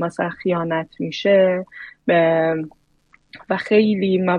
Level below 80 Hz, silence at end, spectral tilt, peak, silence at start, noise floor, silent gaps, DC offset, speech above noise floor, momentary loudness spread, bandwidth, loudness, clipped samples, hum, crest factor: -62 dBFS; 0 s; -7 dB/octave; -4 dBFS; 0 s; -58 dBFS; none; under 0.1%; 39 dB; 11 LU; 9.6 kHz; -19 LUFS; under 0.1%; none; 16 dB